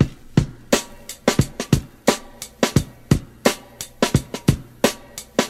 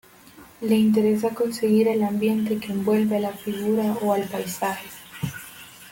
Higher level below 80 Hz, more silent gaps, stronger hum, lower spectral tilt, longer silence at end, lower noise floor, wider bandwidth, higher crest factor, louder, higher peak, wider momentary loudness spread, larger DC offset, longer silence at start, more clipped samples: first, -36 dBFS vs -62 dBFS; neither; neither; about the same, -5 dB/octave vs -6 dB/octave; about the same, 0 s vs 0 s; second, -37 dBFS vs -48 dBFS; about the same, 16 kHz vs 17 kHz; first, 20 dB vs 14 dB; about the same, -22 LUFS vs -23 LUFS; first, 0 dBFS vs -8 dBFS; second, 7 LU vs 13 LU; neither; second, 0 s vs 0.35 s; neither